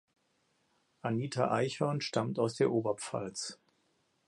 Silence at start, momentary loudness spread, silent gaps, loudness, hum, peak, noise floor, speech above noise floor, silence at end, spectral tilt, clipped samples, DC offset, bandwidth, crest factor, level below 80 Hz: 1.05 s; 9 LU; none; -34 LUFS; none; -14 dBFS; -75 dBFS; 43 dB; 0.75 s; -5.5 dB/octave; under 0.1%; under 0.1%; 11.5 kHz; 20 dB; -74 dBFS